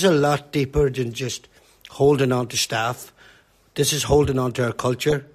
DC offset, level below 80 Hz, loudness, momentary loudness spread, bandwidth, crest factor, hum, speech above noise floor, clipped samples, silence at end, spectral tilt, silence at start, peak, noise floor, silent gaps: under 0.1%; -40 dBFS; -21 LUFS; 14 LU; 14 kHz; 16 dB; none; 33 dB; under 0.1%; 0.1 s; -4.5 dB/octave; 0 s; -6 dBFS; -54 dBFS; none